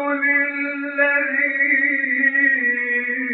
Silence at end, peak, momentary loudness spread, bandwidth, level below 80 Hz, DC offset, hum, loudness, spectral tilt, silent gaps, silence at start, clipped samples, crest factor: 0 s; -6 dBFS; 5 LU; 4.3 kHz; -82 dBFS; under 0.1%; none; -17 LUFS; -0.5 dB/octave; none; 0 s; under 0.1%; 14 dB